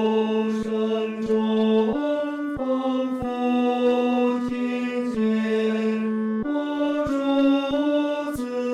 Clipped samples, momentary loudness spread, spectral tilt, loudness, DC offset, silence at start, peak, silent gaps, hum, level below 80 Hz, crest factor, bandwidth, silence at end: under 0.1%; 5 LU; -6.5 dB/octave; -23 LUFS; under 0.1%; 0 s; -10 dBFS; none; none; -54 dBFS; 12 dB; 13 kHz; 0 s